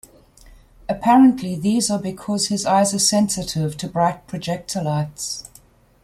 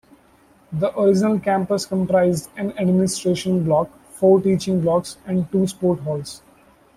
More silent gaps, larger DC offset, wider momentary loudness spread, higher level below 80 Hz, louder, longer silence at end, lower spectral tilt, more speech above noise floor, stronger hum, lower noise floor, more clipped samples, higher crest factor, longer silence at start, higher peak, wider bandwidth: neither; neither; about the same, 13 LU vs 11 LU; about the same, -52 dBFS vs -54 dBFS; about the same, -19 LUFS vs -20 LUFS; about the same, 0.65 s vs 0.6 s; second, -4.5 dB/octave vs -6.5 dB/octave; about the same, 32 dB vs 35 dB; neither; about the same, -51 dBFS vs -54 dBFS; neither; about the same, 18 dB vs 16 dB; first, 0.9 s vs 0.7 s; about the same, -4 dBFS vs -4 dBFS; about the same, 15 kHz vs 14 kHz